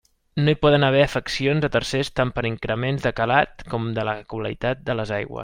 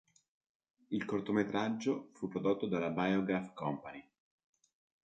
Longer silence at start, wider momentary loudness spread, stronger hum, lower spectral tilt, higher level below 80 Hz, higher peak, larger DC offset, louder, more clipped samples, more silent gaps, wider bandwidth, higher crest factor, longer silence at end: second, 0.35 s vs 0.9 s; about the same, 10 LU vs 8 LU; neither; about the same, -6 dB/octave vs -7 dB/octave; first, -44 dBFS vs -72 dBFS; first, -4 dBFS vs -18 dBFS; neither; first, -22 LUFS vs -36 LUFS; neither; neither; first, 15.5 kHz vs 8.8 kHz; about the same, 18 dB vs 20 dB; second, 0 s vs 1 s